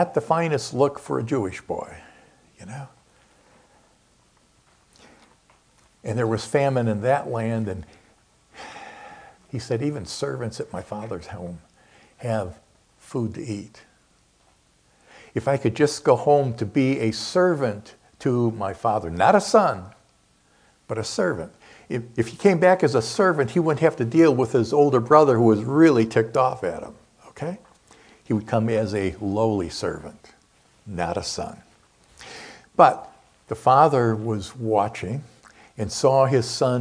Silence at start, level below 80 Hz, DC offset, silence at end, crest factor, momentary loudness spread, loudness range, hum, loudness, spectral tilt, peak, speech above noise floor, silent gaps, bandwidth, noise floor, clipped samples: 0 s; -56 dBFS; under 0.1%; 0 s; 24 dB; 19 LU; 14 LU; none; -22 LUFS; -6 dB/octave; 0 dBFS; 39 dB; none; 10.5 kHz; -61 dBFS; under 0.1%